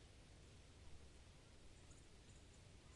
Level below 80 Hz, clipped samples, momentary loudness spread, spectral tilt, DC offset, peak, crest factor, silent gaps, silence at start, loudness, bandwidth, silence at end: -68 dBFS; under 0.1%; 1 LU; -4 dB/octave; under 0.1%; -48 dBFS; 14 dB; none; 0 s; -65 LUFS; 11 kHz; 0 s